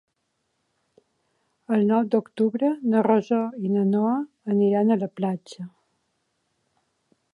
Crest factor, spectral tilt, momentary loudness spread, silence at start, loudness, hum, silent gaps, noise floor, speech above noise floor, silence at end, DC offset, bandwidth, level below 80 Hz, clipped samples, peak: 18 dB; -9 dB/octave; 8 LU; 1.7 s; -23 LUFS; none; none; -75 dBFS; 53 dB; 1.65 s; under 0.1%; 7.2 kHz; -76 dBFS; under 0.1%; -8 dBFS